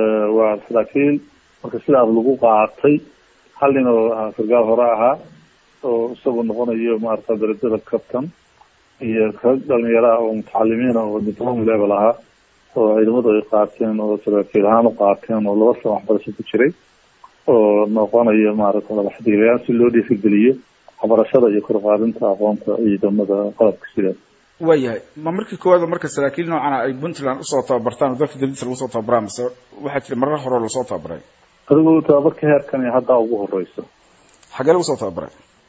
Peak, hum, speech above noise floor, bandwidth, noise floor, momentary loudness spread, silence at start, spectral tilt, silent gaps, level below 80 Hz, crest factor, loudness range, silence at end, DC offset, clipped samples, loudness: 0 dBFS; none; 36 dB; 8 kHz; -53 dBFS; 11 LU; 0 s; -7 dB/octave; none; -58 dBFS; 16 dB; 5 LU; 0.4 s; under 0.1%; under 0.1%; -17 LUFS